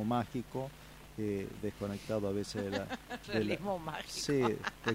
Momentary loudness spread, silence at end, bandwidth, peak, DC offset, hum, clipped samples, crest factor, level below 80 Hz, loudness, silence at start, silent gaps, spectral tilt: 9 LU; 0 s; 16 kHz; -16 dBFS; under 0.1%; none; under 0.1%; 20 dB; -58 dBFS; -37 LUFS; 0 s; none; -5.5 dB/octave